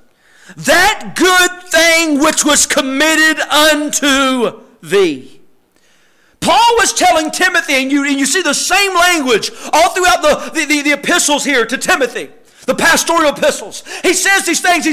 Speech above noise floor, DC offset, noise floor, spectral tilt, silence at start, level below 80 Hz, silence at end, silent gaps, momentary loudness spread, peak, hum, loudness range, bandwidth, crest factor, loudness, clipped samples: 41 dB; under 0.1%; -53 dBFS; -1 dB/octave; 0.5 s; -44 dBFS; 0 s; none; 7 LU; -2 dBFS; none; 4 LU; 16 kHz; 12 dB; -11 LUFS; under 0.1%